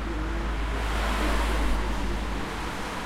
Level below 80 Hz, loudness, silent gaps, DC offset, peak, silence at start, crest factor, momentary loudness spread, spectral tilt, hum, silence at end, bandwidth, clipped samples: -30 dBFS; -29 LUFS; none; under 0.1%; -14 dBFS; 0 s; 14 dB; 5 LU; -5 dB/octave; none; 0 s; 14.5 kHz; under 0.1%